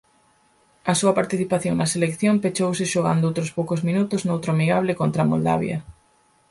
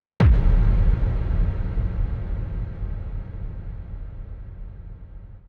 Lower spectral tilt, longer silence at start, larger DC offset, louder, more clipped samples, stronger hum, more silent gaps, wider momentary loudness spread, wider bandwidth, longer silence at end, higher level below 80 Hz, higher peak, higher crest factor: second, -5.5 dB/octave vs -9.5 dB/octave; first, 0.85 s vs 0.2 s; neither; first, -22 LUFS vs -25 LUFS; neither; neither; neither; second, 4 LU vs 21 LU; first, 11.5 kHz vs 4.5 kHz; first, 0.6 s vs 0.1 s; second, -56 dBFS vs -24 dBFS; about the same, -6 dBFS vs -6 dBFS; about the same, 16 dB vs 16 dB